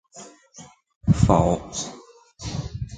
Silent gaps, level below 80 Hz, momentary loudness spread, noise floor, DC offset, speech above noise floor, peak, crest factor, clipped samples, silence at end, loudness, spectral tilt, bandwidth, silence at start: 0.96-1.01 s; -36 dBFS; 25 LU; -43 dBFS; under 0.1%; 21 dB; -2 dBFS; 22 dB; under 0.1%; 0 s; -23 LUFS; -6.5 dB/octave; 9.4 kHz; 0.15 s